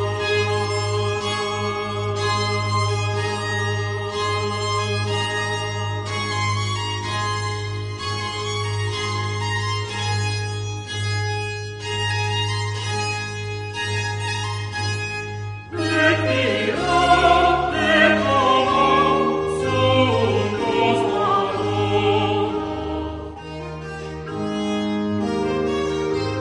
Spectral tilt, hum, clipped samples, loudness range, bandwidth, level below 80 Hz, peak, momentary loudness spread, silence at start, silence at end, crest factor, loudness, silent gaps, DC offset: -5 dB/octave; none; under 0.1%; 8 LU; 10.5 kHz; -44 dBFS; -2 dBFS; 11 LU; 0 s; 0 s; 18 dB; -21 LUFS; none; under 0.1%